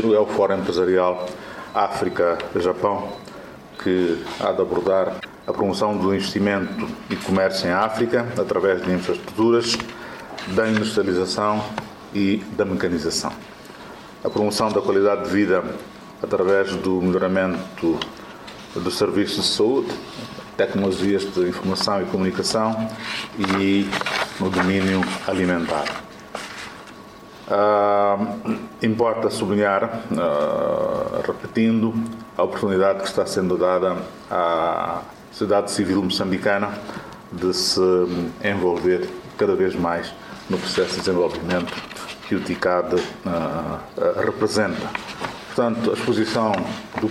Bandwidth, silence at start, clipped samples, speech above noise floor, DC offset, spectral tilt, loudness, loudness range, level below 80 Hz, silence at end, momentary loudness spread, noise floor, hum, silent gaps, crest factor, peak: 15.5 kHz; 0 s; under 0.1%; 20 dB; under 0.1%; -5 dB/octave; -22 LUFS; 2 LU; -54 dBFS; 0 s; 13 LU; -41 dBFS; none; none; 16 dB; -6 dBFS